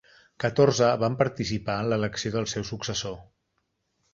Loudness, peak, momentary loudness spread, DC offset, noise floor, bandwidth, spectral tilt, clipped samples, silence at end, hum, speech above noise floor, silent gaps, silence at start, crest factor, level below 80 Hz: -26 LUFS; -6 dBFS; 10 LU; under 0.1%; -76 dBFS; 7.8 kHz; -5 dB/octave; under 0.1%; 0.9 s; none; 51 dB; none; 0.4 s; 20 dB; -54 dBFS